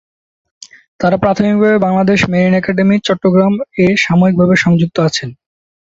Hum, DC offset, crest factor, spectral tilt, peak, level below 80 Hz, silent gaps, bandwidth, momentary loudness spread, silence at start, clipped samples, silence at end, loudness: none; under 0.1%; 12 dB; -6.5 dB/octave; 0 dBFS; -44 dBFS; none; 7.8 kHz; 5 LU; 1 s; under 0.1%; 0.6 s; -12 LUFS